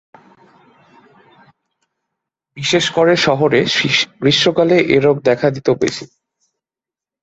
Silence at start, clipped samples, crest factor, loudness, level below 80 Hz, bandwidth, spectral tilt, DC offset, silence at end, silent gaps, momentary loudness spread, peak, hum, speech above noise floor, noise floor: 2.55 s; under 0.1%; 16 dB; -14 LUFS; -54 dBFS; 8.2 kHz; -4.5 dB/octave; under 0.1%; 1.15 s; none; 5 LU; -2 dBFS; none; 75 dB; -89 dBFS